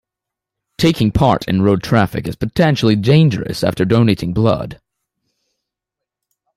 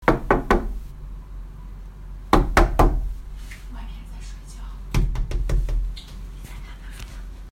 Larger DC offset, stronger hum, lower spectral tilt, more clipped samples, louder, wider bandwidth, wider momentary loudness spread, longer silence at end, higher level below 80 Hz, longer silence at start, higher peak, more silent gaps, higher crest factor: neither; neither; about the same, -7 dB/octave vs -6 dB/octave; neither; first, -15 LUFS vs -23 LUFS; about the same, 14.5 kHz vs 15.5 kHz; second, 7 LU vs 20 LU; first, 1.85 s vs 0 s; second, -40 dBFS vs -26 dBFS; first, 0.8 s vs 0 s; about the same, -2 dBFS vs 0 dBFS; neither; second, 14 dB vs 24 dB